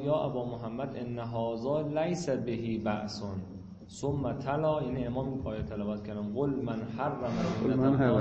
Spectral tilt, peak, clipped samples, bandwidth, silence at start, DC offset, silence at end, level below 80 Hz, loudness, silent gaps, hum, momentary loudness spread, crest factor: -7.5 dB/octave; -14 dBFS; under 0.1%; 8.6 kHz; 0 s; under 0.1%; 0 s; -54 dBFS; -33 LUFS; none; none; 8 LU; 18 dB